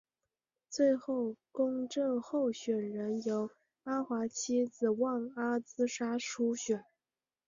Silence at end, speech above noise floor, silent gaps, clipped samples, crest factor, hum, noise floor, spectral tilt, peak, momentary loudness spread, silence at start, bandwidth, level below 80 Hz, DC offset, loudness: 0.65 s; over 56 dB; none; under 0.1%; 16 dB; none; under -90 dBFS; -4.5 dB/octave; -18 dBFS; 6 LU; 0.7 s; 7.6 kHz; -80 dBFS; under 0.1%; -35 LUFS